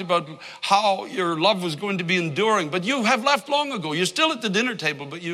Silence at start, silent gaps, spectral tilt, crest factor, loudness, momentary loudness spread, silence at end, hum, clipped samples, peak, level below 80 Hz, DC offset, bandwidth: 0 s; none; -4 dB/octave; 18 dB; -22 LUFS; 6 LU; 0 s; none; under 0.1%; -4 dBFS; -74 dBFS; under 0.1%; 15 kHz